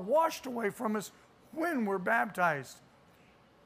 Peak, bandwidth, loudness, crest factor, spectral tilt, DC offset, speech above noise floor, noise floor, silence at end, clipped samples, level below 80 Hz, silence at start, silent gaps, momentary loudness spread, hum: -16 dBFS; 15.5 kHz; -32 LUFS; 18 dB; -5 dB/octave; under 0.1%; 30 dB; -62 dBFS; 0.85 s; under 0.1%; -76 dBFS; 0 s; none; 13 LU; none